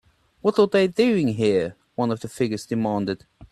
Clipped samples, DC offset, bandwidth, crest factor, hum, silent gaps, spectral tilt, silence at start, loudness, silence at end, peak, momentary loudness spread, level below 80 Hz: under 0.1%; under 0.1%; 12.5 kHz; 18 dB; none; none; -6.5 dB/octave; 0.45 s; -23 LUFS; 0.05 s; -6 dBFS; 8 LU; -58 dBFS